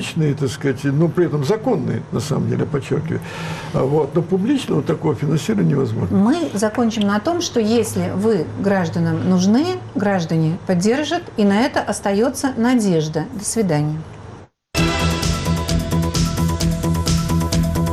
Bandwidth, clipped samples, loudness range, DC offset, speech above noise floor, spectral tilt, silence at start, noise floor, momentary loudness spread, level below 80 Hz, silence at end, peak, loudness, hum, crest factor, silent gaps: 15 kHz; under 0.1%; 2 LU; under 0.1%; 21 dB; -6 dB/octave; 0 s; -39 dBFS; 5 LU; -34 dBFS; 0 s; -8 dBFS; -19 LUFS; none; 10 dB; none